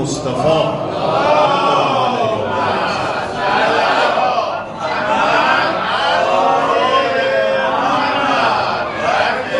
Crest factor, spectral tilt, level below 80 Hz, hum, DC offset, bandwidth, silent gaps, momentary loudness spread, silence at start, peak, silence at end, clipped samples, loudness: 14 dB; -4.5 dB/octave; -50 dBFS; none; 0.1%; 11.5 kHz; none; 6 LU; 0 s; -2 dBFS; 0 s; under 0.1%; -15 LUFS